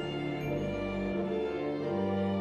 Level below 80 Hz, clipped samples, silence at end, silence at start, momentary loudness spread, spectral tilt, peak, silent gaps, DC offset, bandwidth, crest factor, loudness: -52 dBFS; under 0.1%; 0 s; 0 s; 3 LU; -8 dB/octave; -20 dBFS; none; under 0.1%; 13.5 kHz; 12 dB; -33 LUFS